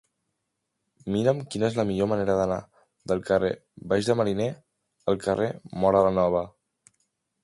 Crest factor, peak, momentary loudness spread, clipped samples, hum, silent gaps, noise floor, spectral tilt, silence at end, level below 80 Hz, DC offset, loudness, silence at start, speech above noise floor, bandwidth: 20 dB; -8 dBFS; 11 LU; under 0.1%; none; none; -80 dBFS; -6.5 dB/octave; 0.95 s; -54 dBFS; under 0.1%; -26 LUFS; 1.05 s; 56 dB; 11.5 kHz